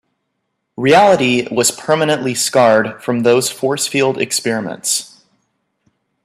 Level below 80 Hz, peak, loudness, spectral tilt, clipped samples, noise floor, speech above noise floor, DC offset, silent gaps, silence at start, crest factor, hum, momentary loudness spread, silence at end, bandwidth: -60 dBFS; 0 dBFS; -14 LUFS; -3.5 dB/octave; under 0.1%; -72 dBFS; 57 dB; under 0.1%; none; 0.8 s; 16 dB; none; 8 LU; 1.2 s; 16 kHz